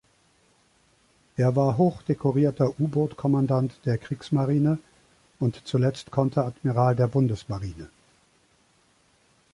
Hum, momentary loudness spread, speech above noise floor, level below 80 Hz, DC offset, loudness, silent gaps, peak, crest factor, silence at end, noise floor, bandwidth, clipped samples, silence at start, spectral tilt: none; 9 LU; 40 dB; -54 dBFS; under 0.1%; -25 LUFS; none; -8 dBFS; 18 dB; 1.65 s; -63 dBFS; 11 kHz; under 0.1%; 1.4 s; -9 dB/octave